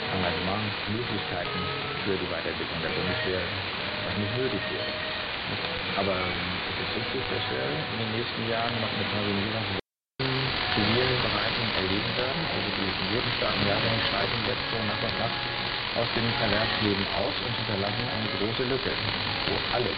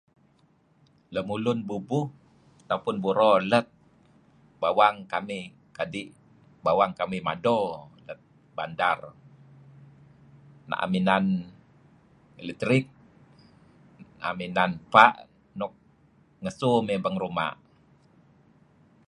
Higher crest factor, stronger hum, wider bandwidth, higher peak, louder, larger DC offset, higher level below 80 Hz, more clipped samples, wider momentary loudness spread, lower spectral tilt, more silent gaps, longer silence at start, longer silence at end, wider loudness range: second, 20 dB vs 28 dB; neither; second, 6 kHz vs 11 kHz; second, -8 dBFS vs 0 dBFS; about the same, -27 LUFS vs -26 LUFS; neither; first, -48 dBFS vs -64 dBFS; neither; second, 5 LU vs 21 LU; first, -8 dB/octave vs -6.5 dB/octave; neither; second, 0 s vs 1.1 s; second, 0 s vs 1.55 s; second, 3 LU vs 6 LU